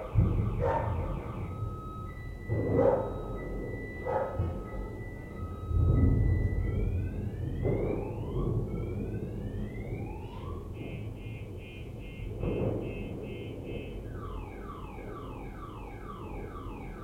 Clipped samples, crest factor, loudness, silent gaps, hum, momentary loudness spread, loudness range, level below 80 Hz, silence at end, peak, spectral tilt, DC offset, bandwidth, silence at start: under 0.1%; 20 dB; -34 LUFS; none; none; 14 LU; 9 LU; -40 dBFS; 0 s; -12 dBFS; -9.5 dB/octave; under 0.1%; 9.6 kHz; 0 s